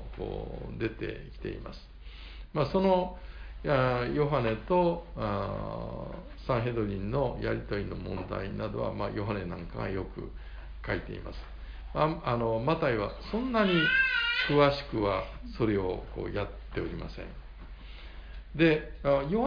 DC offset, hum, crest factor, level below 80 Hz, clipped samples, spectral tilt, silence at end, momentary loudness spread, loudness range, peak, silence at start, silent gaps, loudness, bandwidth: under 0.1%; none; 20 dB; -44 dBFS; under 0.1%; -8 dB/octave; 0 s; 20 LU; 9 LU; -12 dBFS; 0 s; none; -30 LUFS; 5.2 kHz